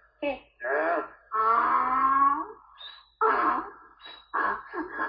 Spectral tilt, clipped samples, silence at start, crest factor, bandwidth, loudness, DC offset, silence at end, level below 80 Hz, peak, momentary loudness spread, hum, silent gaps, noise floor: -7.5 dB/octave; under 0.1%; 0.2 s; 16 dB; 5.2 kHz; -26 LUFS; under 0.1%; 0 s; -64 dBFS; -12 dBFS; 21 LU; none; none; -49 dBFS